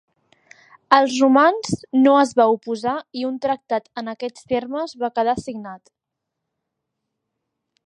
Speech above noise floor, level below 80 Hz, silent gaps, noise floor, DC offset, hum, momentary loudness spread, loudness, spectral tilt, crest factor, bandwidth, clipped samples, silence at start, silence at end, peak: 62 dB; -60 dBFS; none; -81 dBFS; under 0.1%; none; 15 LU; -19 LUFS; -5 dB/octave; 20 dB; 10.5 kHz; under 0.1%; 0.9 s; 2.1 s; 0 dBFS